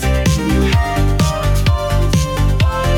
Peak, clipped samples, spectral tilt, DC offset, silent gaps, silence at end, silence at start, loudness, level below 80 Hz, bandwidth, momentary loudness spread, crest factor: -4 dBFS; under 0.1%; -5.5 dB/octave; under 0.1%; none; 0 s; 0 s; -15 LUFS; -18 dBFS; 18 kHz; 2 LU; 10 dB